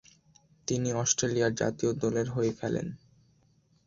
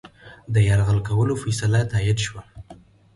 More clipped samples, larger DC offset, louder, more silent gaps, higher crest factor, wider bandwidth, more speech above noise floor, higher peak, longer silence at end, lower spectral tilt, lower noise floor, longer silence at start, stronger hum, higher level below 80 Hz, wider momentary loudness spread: neither; neither; second, -29 LUFS vs -21 LUFS; neither; first, 20 dB vs 14 dB; second, 7.8 kHz vs 11.5 kHz; first, 37 dB vs 28 dB; second, -12 dBFS vs -8 dBFS; first, 0.9 s vs 0.4 s; second, -4.5 dB/octave vs -6 dB/octave; first, -66 dBFS vs -48 dBFS; first, 0.7 s vs 0.05 s; neither; second, -60 dBFS vs -40 dBFS; first, 11 LU vs 7 LU